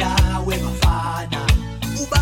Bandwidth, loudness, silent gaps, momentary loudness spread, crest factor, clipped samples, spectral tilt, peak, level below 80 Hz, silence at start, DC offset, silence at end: 17 kHz; -21 LUFS; none; 6 LU; 18 dB; under 0.1%; -4.5 dB/octave; -2 dBFS; -24 dBFS; 0 s; under 0.1%; 0 s